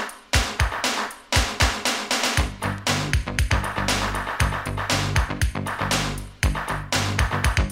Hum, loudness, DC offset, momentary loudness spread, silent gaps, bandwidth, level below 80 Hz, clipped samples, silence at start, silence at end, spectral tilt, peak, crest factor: none; -23 LUFS; under 0.1%; 5 LU; none; 16 kHz; -30 dBFS; under 0.1%; 0 s; 0 s; -3.5 dB/octave; -4 dBFS; 20 dB